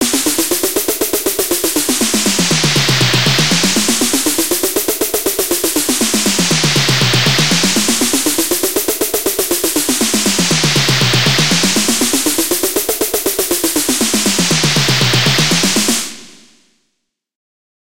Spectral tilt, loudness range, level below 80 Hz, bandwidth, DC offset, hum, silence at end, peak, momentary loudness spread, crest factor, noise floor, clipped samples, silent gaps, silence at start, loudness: -2.5 dB/octave; 1 LU; -42 dBFS; 17.5 kHz; 2%; none; 0.6 s; 0 dBFS; 4 LU; 14 dB; -70 dBFS; under 0.1%; none; 0 s; -12 LUFS